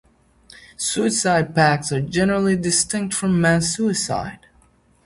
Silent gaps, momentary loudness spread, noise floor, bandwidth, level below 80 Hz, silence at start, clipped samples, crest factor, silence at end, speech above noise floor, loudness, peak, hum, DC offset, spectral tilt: none; 7 LU; -56 dBFS; 11.5 kHz; -48 dBFS; 0.6 s; under 0.1%; 18 dB; 0.7 s; 37 dB; -19 LUFS; -2 dBFS; none; under 0.1%; -4 dB/octave